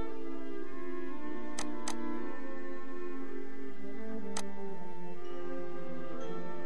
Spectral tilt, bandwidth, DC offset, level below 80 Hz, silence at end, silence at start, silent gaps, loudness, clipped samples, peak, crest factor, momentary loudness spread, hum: -5 dB/octave; 11 kHz; 4%; -64 dBFS; 0 s; 0 s; none; -43 LUFS; under 0.1%; -20 dBFS; 20 dB; 6 LU; none